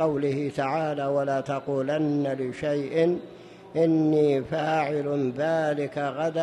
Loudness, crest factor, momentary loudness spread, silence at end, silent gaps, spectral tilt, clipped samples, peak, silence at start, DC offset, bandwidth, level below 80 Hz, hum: -26 LUFS; 14 dB; 7 LU; 0 s; none; -7.5 dB/octave; under 0.1%; -12 dBFS; 0 s; under 0.1%; 10.5 kHz; -64 dBFS; none